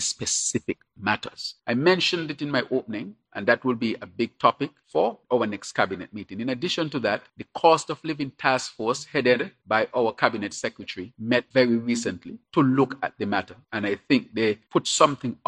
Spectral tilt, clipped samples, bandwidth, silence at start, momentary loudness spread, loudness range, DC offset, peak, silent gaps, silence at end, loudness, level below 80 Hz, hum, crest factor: -4 dB/octave; under 0.1%; 11 kHz; 0 s; 12 LU; 2 LU; under 0.1%; -2 dBFS; none; 0.15 s; -25 LUFS; -68 dBFS; none; 24 dB